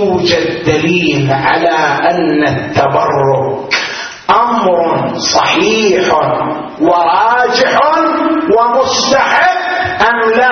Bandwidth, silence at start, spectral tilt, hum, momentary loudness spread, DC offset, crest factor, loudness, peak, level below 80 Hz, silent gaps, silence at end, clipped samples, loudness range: 6.6 kHz; 0 s; -4 dB/octave; none; 5 LU; under 0.1%; 10 dB; -11 LUFS; 0 dBFS; -46 dBFS; none; 0 s; under 0.1%; 2 LU